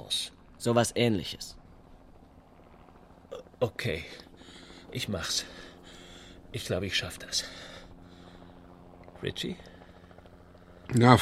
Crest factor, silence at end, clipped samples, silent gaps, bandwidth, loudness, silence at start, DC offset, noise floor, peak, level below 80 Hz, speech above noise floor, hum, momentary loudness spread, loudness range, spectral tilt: 30 dB; 0 s; under 0.1%; none; 16 kHz; -31 LUFS; 0 s; under 0.1%; -55 dBFS; -2 dBFS; -56 dBFS; 27 dB; none; 25 LU; 7 LU; -4.5 dB/octave